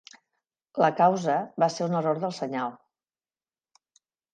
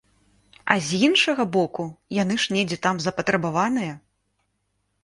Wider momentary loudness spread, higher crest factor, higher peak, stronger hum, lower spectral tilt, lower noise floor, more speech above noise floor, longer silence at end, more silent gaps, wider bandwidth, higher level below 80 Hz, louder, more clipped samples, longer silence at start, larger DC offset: about the same, 11 LU vs 11 LU; about the same, 20 dB vs 24 dB; second, -8 dBFS vs -2 dBFS; second, none vs 50 Hz at -45 dBFS; first, -6 dB/octave vs -4.5 dB/octave; first, under -90 dBFS vs -73 dBFS; first, over 65 dB vs 50 dB; first, 1.6 s vs 1.05 s; neither; second, 9.4 kHz vs 11.5 kHz; second, -80 dBFS vs -62 dBFS; second, -26 LUFS vs -22 LUFS; neither; about the same, 0.75 s vs 0.65 s; neither